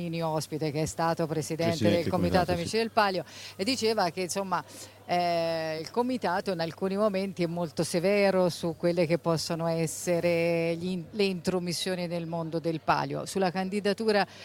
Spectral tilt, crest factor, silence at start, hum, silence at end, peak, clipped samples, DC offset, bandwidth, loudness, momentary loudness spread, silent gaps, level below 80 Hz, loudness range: -5 dB/octave; 18 dB; 0 s; none; 0 s; -10 dBFS; under 0.1%; under 0.1%; 17 kHz; -29 LUFS; 6 LU; none; -60 dBFS; 2 LU